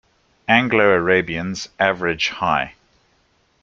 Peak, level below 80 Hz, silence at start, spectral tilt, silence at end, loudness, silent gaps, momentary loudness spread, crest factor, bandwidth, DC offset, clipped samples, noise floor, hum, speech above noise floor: -2 dBFS; -52 dBFS; 0.5 s; -4.5 dB/octave; 0.9 s; -18 LUFS; none; 12 LU; 18 dB; 7.6 kHz; under 0.1%; under 0.1%; -61 dBFS; none; 43 dB